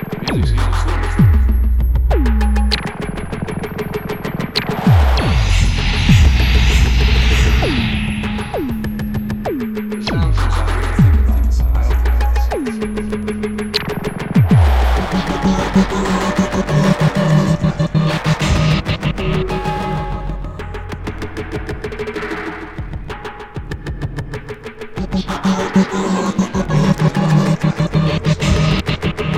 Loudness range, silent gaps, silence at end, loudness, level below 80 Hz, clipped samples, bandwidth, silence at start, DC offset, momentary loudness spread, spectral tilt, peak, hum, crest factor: 10 LU; none; 0 s; -17 LUFS; -20 dBFS; under 0.1%; 13.5 kHz; 0 s; under 0.1%; 13 LU; -6.5 dB/octave; 0 dBFS; none; 16 dB